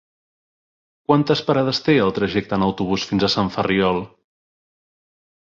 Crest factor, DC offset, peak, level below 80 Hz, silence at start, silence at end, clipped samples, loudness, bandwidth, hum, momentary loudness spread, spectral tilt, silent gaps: 18 dB; under 0.1%; -2 dBFS; -50 dBFS; 1.1 s; 1.35 s; under 0.1%; -19 LUFS; 7.6 kHz; none; 5 LU; -6 dB/octave; none